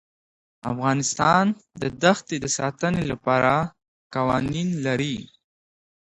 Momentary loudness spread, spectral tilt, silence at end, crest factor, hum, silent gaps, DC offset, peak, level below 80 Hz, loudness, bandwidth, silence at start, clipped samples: 12 LU; -4.5 dB/octave; 0.8 s; 22 dB; none; 3.88-4.10 s; under 0.1%; -2 dBFS; -52 dBFS; -23 LUFS; 10.5 kHz; 0.65 s; under 0.1%